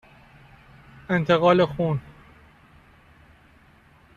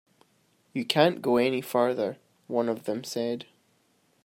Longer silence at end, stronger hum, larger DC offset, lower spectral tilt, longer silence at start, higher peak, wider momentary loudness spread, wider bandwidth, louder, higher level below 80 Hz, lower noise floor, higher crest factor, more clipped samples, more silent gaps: first, 2.05 s vs 0.8 s; neither; neither; first, -7.5 dB/octave vs -5 dB/octave; first, 1.1 s vs 0.75 s; about the same, -6 dBFS vs -6 dBFS; about the same, 12 LU vs 12 LU; second, 7.6 kHz vs 16 kHz; first, -22 LUFS vs -27 LUFS; first, -56 dBFS vs -74 dBFS; second, -55 dBFS vs -68 dBFS; about the same, 22 dB vs 22 dB; neither; neither